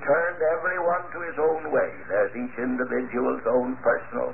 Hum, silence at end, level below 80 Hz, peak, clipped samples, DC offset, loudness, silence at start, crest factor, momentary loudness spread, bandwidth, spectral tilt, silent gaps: none; 0 s; -60 dBFS; -10 dBFS; under 0.1%; 0.9%; -26 LUFS; 0 s; 16 dB; 4 LU; 2.9 kHz; -11.5 dB/octave; none